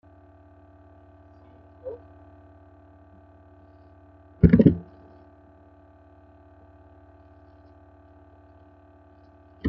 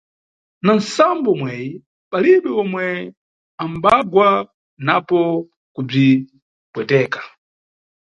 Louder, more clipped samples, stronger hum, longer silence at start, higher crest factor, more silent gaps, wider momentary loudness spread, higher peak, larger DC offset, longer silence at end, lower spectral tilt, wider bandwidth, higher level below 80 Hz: about the same, -19 LUFS vs -17 LUFS; neither; neither; first, 1.85 s vs 0.65 s; first, 26 dB vs 18 dB; second, none vs 1.86-2.11 s, 3.17-3.58 s, 4.54-4.77 s, 5.56-5.75 s, 6.42-6.73 s; first, 27 LU vs 17 LU; about the same, -2 dBFS vs 0 dBFS; neither; second, 0 s vs 0.9 s; first, -10.5 dB/octave vs -6.5 dB/octave; second, 5 kHz vs 9 kHz; first, -44 dBFS vs -58 dBFS